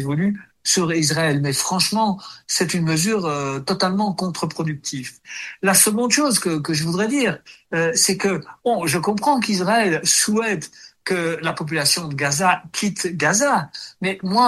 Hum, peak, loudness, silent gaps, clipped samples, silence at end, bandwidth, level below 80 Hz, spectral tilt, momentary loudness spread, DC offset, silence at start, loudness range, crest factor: none; 0 dBFS; -19 LUFS; none; under 0.1%; 0 s; 13 kHz; -60 dBFS; -3.5 dB/octave; 9 LU; under 0.1%; 0 s; 2 LU; 20 dB